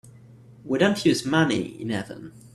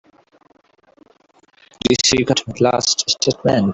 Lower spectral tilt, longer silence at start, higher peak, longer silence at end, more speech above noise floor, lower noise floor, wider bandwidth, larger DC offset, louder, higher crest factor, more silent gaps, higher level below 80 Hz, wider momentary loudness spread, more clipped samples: first, -5 dB/octave vs -3.5 dB/octave; second, 0.05 s vs 1.85 s; second, -6 dBFS vs -2 dBFS; about the same, 0.05 s vs 0 s; second, 25 dB vs 39 dB; second, -49 dBFS vs -56 dBFS; first, 14 kHz vs 8.4 kHz; neither; second, -23 LUFS vs -16 LUFS; about the same, 20 dB vs 18 dB; neither; second, -60 dBFS vs -48 dBFS; first, 13 LU vs 4 LU; neither